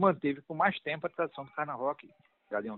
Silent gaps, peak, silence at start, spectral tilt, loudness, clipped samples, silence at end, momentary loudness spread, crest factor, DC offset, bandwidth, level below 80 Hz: none; -12 dBFS; 0 s; -4.5 dB/octave; -33 LUFS; under 0.1%; 0 s; 8 LU; 22 dB; under 0.1%; 4.3 kHz; -74 dBFS